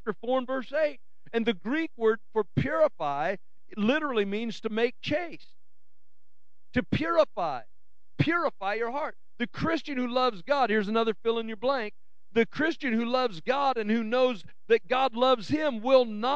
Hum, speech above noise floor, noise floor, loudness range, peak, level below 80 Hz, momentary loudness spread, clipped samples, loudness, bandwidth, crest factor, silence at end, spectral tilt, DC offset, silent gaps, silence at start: none; 55 dB; -83 dBFS; 4 LU; -8 dBFS; -60 dBFS; 8 LU; under 0.1%; -28 LUFS; 8 kHz; 20 dB; 0 s; -6.5 dB/octave; 1%; none; 0.05 s